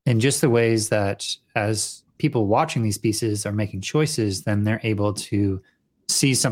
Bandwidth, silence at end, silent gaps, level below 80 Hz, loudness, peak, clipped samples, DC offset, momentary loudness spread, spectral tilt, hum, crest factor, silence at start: 16.5 kHz; 0 s; none; -60 dBFS; -22 LUFS; -6 dBFS; under 0.1%; under 0.1%; 8 LU; -4.5 dB/octave; none; 16 dB; 0.05 s